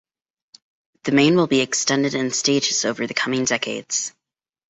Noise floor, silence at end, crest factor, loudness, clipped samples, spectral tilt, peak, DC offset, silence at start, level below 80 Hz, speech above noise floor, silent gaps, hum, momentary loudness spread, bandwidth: -84 dBFS; 0.6 s; 18 dB; -20 LUFS; under 0.1%; -3 dB/octave; -2 dBFS; under 0.1%; 1.05 s; -62 dBFS; 64 dB; none; none; 8 LU; 8.4 kHz